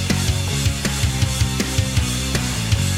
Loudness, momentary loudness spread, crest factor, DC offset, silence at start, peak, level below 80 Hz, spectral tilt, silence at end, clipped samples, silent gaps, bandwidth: -20 LUFS; 1 LU; 14 dB; under 0.1%; 0 s; -6 dBFS; -28 dBFS; -4 dB/octave; 0 s; under 0.1%; none; 16 kHz